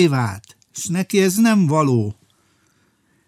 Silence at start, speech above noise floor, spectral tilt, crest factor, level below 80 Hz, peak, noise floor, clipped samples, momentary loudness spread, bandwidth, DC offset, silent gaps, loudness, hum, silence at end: 0 s; 45 dB; -5.5 dB/octave; 16 dB; -62 dBFS; -4 dBFS; -61 dBFS; under 0.1%; 14 LU; 15.5 kHz; under 0.1%; none; -18 LUFS; none; 1.15 s